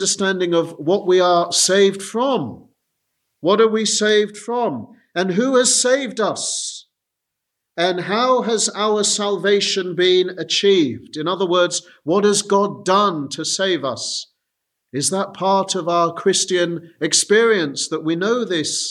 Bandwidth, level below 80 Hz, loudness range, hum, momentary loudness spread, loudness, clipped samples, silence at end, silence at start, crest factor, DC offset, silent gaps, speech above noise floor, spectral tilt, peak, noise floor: 13.5 kHz; -72 dBFS; 3 LU; none; 9 LU; -18 LUFS; under 0.1%; 0 s; 0 s; 16 dB; under 0.1%; none; 62 dB; -3 dB/octave; -2 dBFS; -80 dBFS